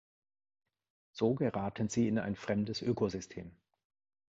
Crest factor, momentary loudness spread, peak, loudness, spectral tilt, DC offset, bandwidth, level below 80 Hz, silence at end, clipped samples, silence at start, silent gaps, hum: 18 dB; 16 LU; -18 dBFS; -34 LUFS; -6 dB/octave; under 0.1%; 8 kHz; -62 dBFS; 0.85 s; under 0.1%; 1.15 s; none; none